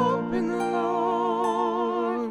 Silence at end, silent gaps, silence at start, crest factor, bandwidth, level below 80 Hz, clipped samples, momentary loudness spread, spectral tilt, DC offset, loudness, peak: 0 s; none; 0 s; 14 dB; 12 kHz; -60 dBFS; under 0.1%; 2 LU; -6.5 dB/octave; under 0.1%; -26 LUFS; -12 dBFS